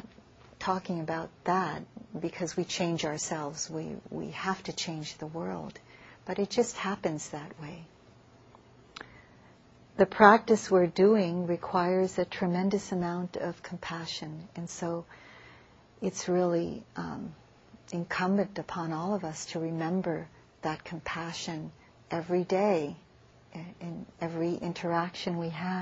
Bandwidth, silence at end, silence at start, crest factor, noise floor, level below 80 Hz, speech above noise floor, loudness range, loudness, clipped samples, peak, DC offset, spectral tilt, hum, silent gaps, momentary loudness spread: 8.2 kHz; 0 s; 0.05 s; 30 dB; -58 dBFS; -64 dBFS; 28 dB; 10 LU; -31 LUFS; under 0.1%; -2 dBFS; under 0.1%; -5 dB/octave; none; none; 17 LU